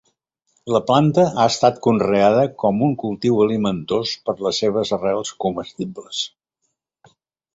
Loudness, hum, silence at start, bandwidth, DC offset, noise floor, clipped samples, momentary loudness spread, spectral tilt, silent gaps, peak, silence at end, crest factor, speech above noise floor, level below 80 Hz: -19 LUFS; none; 0.65 s; 8 kHz; under 0.1%; -74 dBFS; under 0.1%; 10 LU; -5.5 dB/octave; none; -2 dBFS; 1.25 s; 18 dB; 56 dB; -56 dBFS